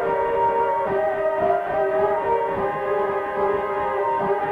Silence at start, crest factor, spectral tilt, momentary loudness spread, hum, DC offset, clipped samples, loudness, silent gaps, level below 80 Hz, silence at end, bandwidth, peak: 0 s; 12 dB; -7 dB/octave; 3 LU; none; under 0.1%; under 0.1%; -22 LUFS; none; -52 dBFS; 0 s; 5.6 kHz; -8 dBFS